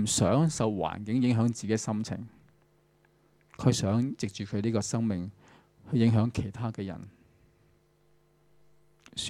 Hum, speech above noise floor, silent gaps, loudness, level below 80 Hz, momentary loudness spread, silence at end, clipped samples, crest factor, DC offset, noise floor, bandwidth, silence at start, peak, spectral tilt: none; 38 dB; none; -29 LUFS; -58 dBFS; 14 LU; 0 s; under 0.1%; 22 dB; under 0.1%; -66 dBFS; 14 kHz; 0 s; -8 dBFS; -5.5 dB/octave